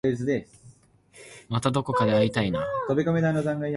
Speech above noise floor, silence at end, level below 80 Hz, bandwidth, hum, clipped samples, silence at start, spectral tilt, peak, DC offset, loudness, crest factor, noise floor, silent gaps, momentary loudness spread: 30 dB; 0 s; -54 dBFS; 11.5 kHz; none; under 0.1%; 0.05 s; -7 dB/octave; -10 dBFS; under 0.1%; -25 LUFS; 16 dB; -55 dBFS; none; 9 LU